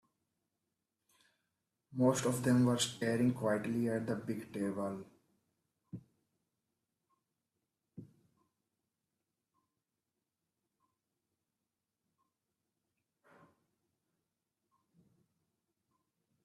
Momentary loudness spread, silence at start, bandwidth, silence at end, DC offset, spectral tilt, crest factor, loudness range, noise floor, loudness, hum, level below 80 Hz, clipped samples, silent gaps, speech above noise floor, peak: 20 LU; 1.9 s; 14 kHz; 8.4 s; under 0.1%; -5.5 dB/octave; 22 dB; 13 LU; -90 dBFS; -34 LUFS; none; -78 dBFS; under 0.1%; none; 56 dB; -18 dBFS